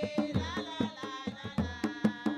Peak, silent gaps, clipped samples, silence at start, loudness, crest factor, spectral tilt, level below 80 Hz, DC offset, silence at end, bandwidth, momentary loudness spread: -14 dBFS; none; under 0.1%; 0 s; -35 LUFS; 20 dB; -6 dB/octave; -52 dBFS; under 0.1%; 0 s; 11.5 kHz; 7 LU